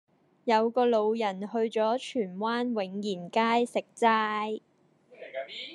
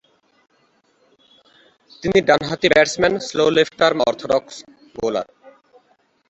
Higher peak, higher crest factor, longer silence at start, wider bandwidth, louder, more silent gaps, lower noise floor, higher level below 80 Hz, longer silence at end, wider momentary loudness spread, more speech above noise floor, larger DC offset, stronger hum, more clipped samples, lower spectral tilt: second, -10 dBFS vs -2 dBFS; about the same, 20 dB vs 20 dB; second, 0.45 s vs 2 s; first, 11.5 kHz vs 8.2 kHz; second, -28 LUFS vs -18 LUFS; neither; about the same, -60 dBFS vs -61 dBFS; second, -88 dBFS vs -52 dBFS; second, 0 s vs 1.05 s; second, 12 LU vs 17 LU; second, 32 dB vs 43 dB; neither; neither; neither; about the same, -5 dB/octave vs -4 dB/octave